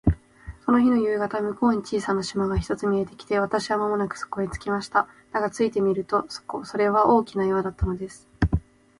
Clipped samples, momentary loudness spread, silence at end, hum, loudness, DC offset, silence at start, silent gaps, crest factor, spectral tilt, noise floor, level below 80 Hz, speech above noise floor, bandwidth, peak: under 0.1%; 9 LU; 0.4 s; none; -25 LUFS; under 0.1%; 0.05 s; none; 18 dB; -6.5 dB/octave; -43 dBFS; -38 dBFS; 20 dB; 11.5 kHz; -6 dBFS